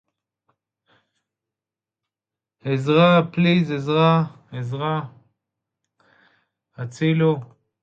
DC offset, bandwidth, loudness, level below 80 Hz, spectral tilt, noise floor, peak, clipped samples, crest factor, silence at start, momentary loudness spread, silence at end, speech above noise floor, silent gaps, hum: under 0.1%; 7.6 kHz; -20 LUFS; -66 dBFS; -8 dB/octave; -89 dBFS; -4 dBFS; under 0.1%; 20 dB; 2.65 s; 17 LU; 0.4 s; 70 dB; none; none